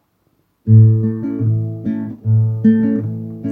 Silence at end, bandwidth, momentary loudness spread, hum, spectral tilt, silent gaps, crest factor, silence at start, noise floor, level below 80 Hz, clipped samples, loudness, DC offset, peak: 0 s; 1.9 kHz; 13 LU; none; -13 dB/octave; none; 14 dB; 0.65 s; -62 dBFS; -54 dBFS; under 0.1%; -16 LUFS; under 0.1%; 0 dBFS